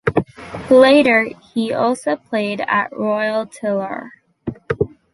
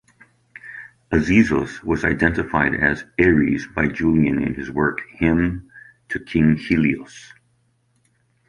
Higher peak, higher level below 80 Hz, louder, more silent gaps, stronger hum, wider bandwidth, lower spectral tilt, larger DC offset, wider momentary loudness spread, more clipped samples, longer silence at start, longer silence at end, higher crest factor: about the same, -2 dBFS vs -2 dBFS; second, -48 dBFS vs -38 dBFS; about the same, -17 LUFS vs -19 LUFS; neither; neither; about the same, 11.5 kHz vs 10.5 kHz; second, -6 dB/octave vs -7.5 dB/octave; neither; first, 20 LU vs 16 LU; neither; second, 0.05 s vs 0.65 s; second, 0.25 s vs 1.25 s; about the same, 16 dB vs 18 dB